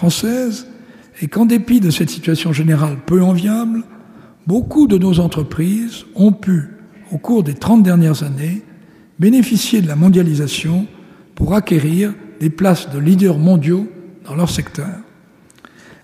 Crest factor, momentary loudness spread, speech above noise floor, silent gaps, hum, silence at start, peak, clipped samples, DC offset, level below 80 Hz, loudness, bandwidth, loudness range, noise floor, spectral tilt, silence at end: 14 dB; 13 LU; 34 dB; none; none; 0 s; -2 dBFS; under 0.1%; under 0.1%; -40 dBFS; -15 LUFS; 15.5 kHz; 2 LU; -47 dBFS; -6.5 dB/octave; 1 s